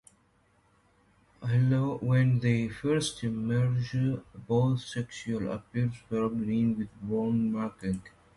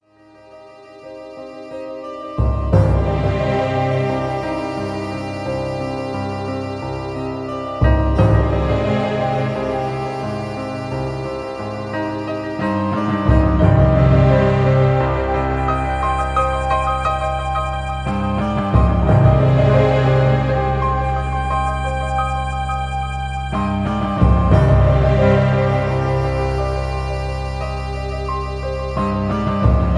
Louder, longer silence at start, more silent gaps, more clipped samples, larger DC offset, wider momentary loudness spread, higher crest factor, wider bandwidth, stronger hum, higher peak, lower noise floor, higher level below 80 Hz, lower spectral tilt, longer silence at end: second, -30 LUFS vs -18 LUFS; first, 1.4 s vs 0.55 s; neither; neither; neither; about the same, 9 LU vs 11 LU; about the same, 16 dB vs 16 dB; first, 11.5 kHz vs 10 kHz; neither; second, -14 dBFS vs 0 dBFS; first, -67 dBFS vs -47 dBFS; second, -58 dBFS vs -24 dBFS; about the same, -7 dB/octave vs -8 dB/octave; first, 0.3 s vs 0 s